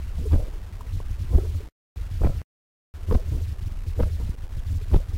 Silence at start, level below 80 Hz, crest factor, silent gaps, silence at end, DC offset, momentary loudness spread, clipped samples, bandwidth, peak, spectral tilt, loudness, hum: 0 s; -26 dBFS; 20 dB; 1.72-1.96 s, 2.44-2.94 s; 0 s; under 0.1%; 13 LU; under 0.1%; 15 kHz; -6 dBFS; -8 dB/octave; -28 LUFS; none